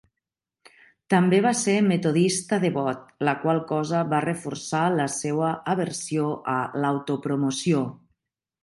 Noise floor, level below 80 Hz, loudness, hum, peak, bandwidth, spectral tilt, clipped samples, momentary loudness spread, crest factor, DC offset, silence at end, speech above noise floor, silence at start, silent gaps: -86 dBFS; -68 dBFS; -24 LUFS; none; -6 dBFS; 11.5 kHz; -5.5 dB/octave; under 0.1%; 6 LU; 18 dB; under 0.1%; 0.65 s; 63 dB; 1.1 s; none